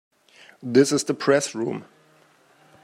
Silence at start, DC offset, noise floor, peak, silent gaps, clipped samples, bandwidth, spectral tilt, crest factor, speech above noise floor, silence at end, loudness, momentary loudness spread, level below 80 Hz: 0.65 s; under 0.1%; -58 dBFS; -4 dBFS; none; under 0.1%; 14 kHz; -4.5 dB/octave; 22 dB; 36 dB; 1 s; -22 LUFS; 15 LU; -72 dBFS